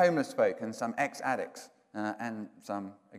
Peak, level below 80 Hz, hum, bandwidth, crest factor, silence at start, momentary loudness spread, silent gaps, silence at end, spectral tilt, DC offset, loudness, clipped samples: -14 dBFS; -86 dBFS; none; 15.5 kHz; 18 dB; 0 s; 13 LU; none; 0 s; -5.5 dB/octave; under 0.1%; -34 LUFS; under 0.1%